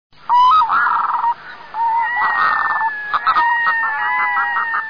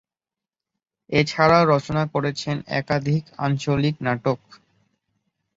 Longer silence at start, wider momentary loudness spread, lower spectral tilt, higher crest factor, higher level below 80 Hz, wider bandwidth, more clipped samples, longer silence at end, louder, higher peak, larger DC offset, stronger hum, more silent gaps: second, 0.3 s vs 1.1 s; about the same, 7 LU vs 9 LU; second, -2.5 dB/octave vs -6.5 dB/octave; second, 10 dB vs 22 dB; about the same, -56 dBFS vs -52 dBFS; second, 5.4 kHz vs 7.8 kHz; neither; second, 0 s vs 1.2 s; first, -15 LUFS vs -22 LUFS; second, -6 dBFS vs -2 dBFS; first, 0.5% vs under 0.1%; neither; neither